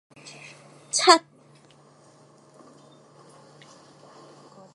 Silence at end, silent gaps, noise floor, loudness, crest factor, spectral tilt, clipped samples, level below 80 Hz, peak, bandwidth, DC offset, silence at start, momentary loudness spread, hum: 3.55 s; none; -55 dBFS; -19 LUFS; 28 dB; -1 dB/octave; under 0.1%; -82 dBFS; 0 dBFS; 11.5 kHz; under 0.1%; 0.95 s; 28 LU; none